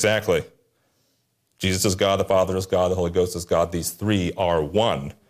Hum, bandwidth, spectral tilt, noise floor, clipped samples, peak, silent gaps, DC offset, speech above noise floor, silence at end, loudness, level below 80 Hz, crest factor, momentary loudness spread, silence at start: none; 15.5 kHz; -4.5 dB/octave; -69 dBFS; under 0.1%; -8 dBFS; none; under 0.1%; 47 dB; 0.2 s; -22 LUFS; -52 dBFS; 14 dB; 5 LU; 0 s